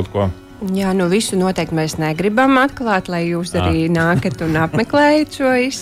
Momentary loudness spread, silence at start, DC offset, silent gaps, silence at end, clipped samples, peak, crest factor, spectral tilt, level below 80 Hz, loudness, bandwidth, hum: 7 LU; 0 s; under 0.1%; none; 0 s; under 0.1%; -4 dBFS; 12 dB; -5.5 dB/octave; -40 dBFS; -16 LUFS; 15.5 kHz; none